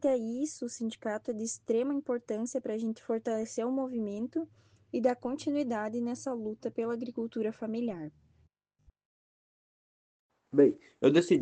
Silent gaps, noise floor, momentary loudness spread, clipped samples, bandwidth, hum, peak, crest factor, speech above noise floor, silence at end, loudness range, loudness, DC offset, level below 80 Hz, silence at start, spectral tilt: 9.05-10.29 s; -70 dBFS; 11 LU; under 0.1%; 9.8 kHz; none; -12 dBFS; 22 dB; 38 dB; 0 s; 5 LU; -32 LUFS; under 0.1%; -76 dBFS; 0 s; -5.5 dB/octave